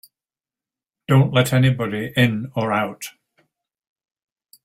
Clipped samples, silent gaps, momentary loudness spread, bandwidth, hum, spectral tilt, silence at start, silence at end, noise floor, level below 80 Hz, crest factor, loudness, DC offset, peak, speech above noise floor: under 0.1%; none; 17 LU; 15 kHz; none; -6 dB/octave; 1.1 s; 1.55 s; under -90 dBFS; -56 dBFS; 20 dB; -19 LUFS; under 0.1%; -2 dBFS; over 72 dB